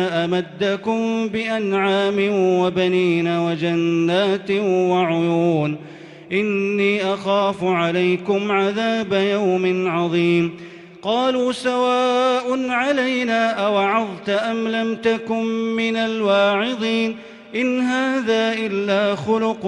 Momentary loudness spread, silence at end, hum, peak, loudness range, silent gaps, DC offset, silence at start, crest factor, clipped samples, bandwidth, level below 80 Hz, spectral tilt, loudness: 4 LU; 0 s; none; -6 dBFS; 2 LU; none; under 0.1%; 0 s; 14 dB; under 0.1%; 11 kHz; -64 dBFS; -6 dB/octave; -19 LUFS